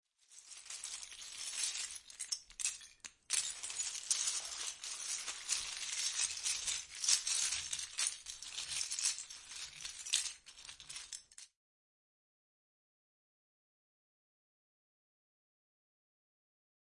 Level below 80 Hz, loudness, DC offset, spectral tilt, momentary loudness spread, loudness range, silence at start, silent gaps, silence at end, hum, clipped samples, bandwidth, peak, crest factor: -76 dBFS; -38 LUFS; under 0.1%; 3.5 dB/octave; 15 LU; 8 LU; 0.3 s; none; 5.45 s; none; under 0.1%; 11.5 kHz; -14 dBFS; 30 dB